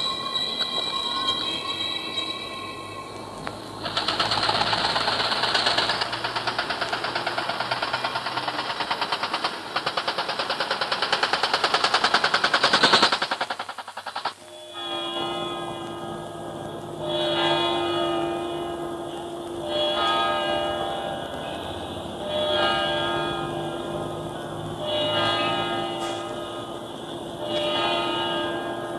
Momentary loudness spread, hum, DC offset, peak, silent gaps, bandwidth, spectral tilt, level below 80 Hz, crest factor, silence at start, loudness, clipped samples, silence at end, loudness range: 13 LU; none; under 0.1%; -4 dBFS; none; 14 kHz; -3 dB/octave; -56 dBFS; 22 dB; 0 s; -25 LUFS; under 0.1%; 0 s; 6 LU